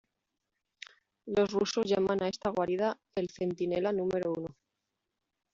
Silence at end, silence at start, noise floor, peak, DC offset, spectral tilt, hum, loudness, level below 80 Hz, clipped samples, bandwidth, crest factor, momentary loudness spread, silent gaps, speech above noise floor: 1 s; 1.25 s; -86 dBFS; -16 dBFS; under 0.1%; -5 dB/octave; none; -32 LUFS; -66 dBFS; under 0.1%; 7.6 kHz; 18 dB; 21 LU; none; 55 dB